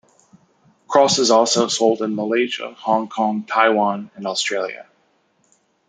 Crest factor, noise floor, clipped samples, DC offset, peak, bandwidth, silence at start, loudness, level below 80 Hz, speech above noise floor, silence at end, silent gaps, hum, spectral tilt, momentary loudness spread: 18 dB; -62 dBFS; under 0.1%; under 0.1%; -2 dBFS; 9.6 kHz; 0.9 s; -18 LUFS; -70 dBFS; 44 dB; 1.05 s; none; none; -3 dB/octave; 11 LU